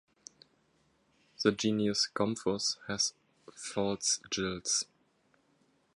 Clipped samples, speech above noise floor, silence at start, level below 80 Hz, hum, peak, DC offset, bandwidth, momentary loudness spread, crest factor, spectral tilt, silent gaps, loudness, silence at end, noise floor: under 0.1%; 39 dB; 1.4 s; -66 dBFS; none; -10 dBFS; under 0.1%; 11.5 kHz; 5 LU; 24 dB; -3 dB/octave; none; -32 LUFS; 1.1 s; -71 dBFS